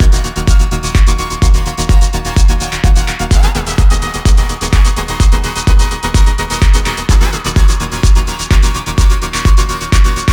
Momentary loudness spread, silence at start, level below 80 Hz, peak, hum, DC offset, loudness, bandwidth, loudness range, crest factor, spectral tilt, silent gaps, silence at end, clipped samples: 2 LU; 0 s; -10 dBFS; 0 dBFS; none; under 0.1%; -13 LUFS; 17 kHz; 0 LU; 8 dB; -4.5 dB/octave; none; 0 s; under 0.1%